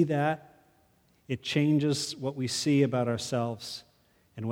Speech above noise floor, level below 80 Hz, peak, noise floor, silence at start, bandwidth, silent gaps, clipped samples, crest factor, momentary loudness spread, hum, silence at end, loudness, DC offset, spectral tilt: 38 dB; -70 dBFS; -12 dBFS; -66 dBFS; 0 s; 16.5 kHz; none; under 0.1%; 18 dB; 13 LU; none; 0 s; -29 LUFS; under 0.1%; -5.5 dB/octave